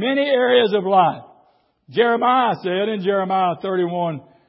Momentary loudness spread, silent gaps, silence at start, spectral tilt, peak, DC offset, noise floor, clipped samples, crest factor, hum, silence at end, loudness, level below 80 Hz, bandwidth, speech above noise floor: 8 LU; none; 0 s; -10.5 dB/octave; -4 dBFS; under 0.1%; -59 dBFS; under 0.1%; 16 dB; none; 0.3 s; -18 LUFS; -72 dBFS; 5.8 kHz; 41 dB